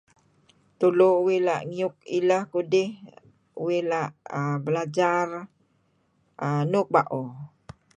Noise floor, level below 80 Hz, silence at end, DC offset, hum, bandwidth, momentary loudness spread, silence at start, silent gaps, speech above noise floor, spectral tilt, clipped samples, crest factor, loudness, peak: -68 dBFS; -70 dBFS; 0.5 s; under 0.1%; none; 9.2 kHz; 13 LU; 0.8 s; none; 44 dB; -7 dB/octave; under 0.1%; 20 dB; -25 LUFS; -6 dBFS